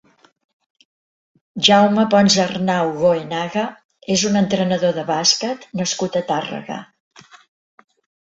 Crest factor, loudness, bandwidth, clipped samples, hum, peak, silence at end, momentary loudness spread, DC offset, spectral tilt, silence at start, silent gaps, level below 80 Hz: 20 dB; -17 LUFS; 8 kHz; under 0.1%; none; 0 dBFS; 1.45 s; 14 LU; under 0.1%; -4 dB/octave; 1.55 s; 3.85-3.89 s; -60 dBFS